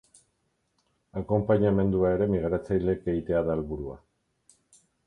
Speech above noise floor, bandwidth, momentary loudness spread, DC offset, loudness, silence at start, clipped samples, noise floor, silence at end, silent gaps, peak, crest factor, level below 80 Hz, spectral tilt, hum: 49 dB; 10.5 kHz; 14 LU; under 0.1%; -27 LUFS; 1.15 s; under 0.1%; -74 dBFS; 1.1 s; none; -10 dBFS; 18 dB; -46 dBFS; -9.5 dB/octave; none